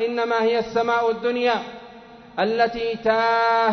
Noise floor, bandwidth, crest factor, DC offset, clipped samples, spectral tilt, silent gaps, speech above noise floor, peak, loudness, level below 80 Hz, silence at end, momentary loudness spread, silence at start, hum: -44 dBFS; 6.4 kHz; 14 dB; under 0.1%; under 0.1%; -5 dB/octave; none; 23 dB; -8 dBFS; -21 LUFS; -58 dBFS; 0 s; 8 LU; 0 s; none